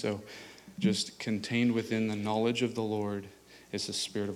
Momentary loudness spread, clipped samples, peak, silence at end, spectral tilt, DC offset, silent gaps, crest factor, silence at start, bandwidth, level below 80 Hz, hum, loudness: 13 LU; under 0.1%; -16 dBFS; 0 s; -5 dB/octave; under 0.1%; none; 16 dB; 0 s; 15.5 kHz; -72 dBFS; none; -32 LUFS